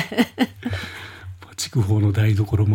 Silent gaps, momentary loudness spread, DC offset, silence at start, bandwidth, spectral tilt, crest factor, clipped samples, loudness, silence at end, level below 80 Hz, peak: none; 17 LU; under 0.1%; 0 s; 16.5 kHz; -6 dB/octave; 16 dB; under 0.1%; -22 LUFS; 0 s; -52 dBFS; -4 dBFS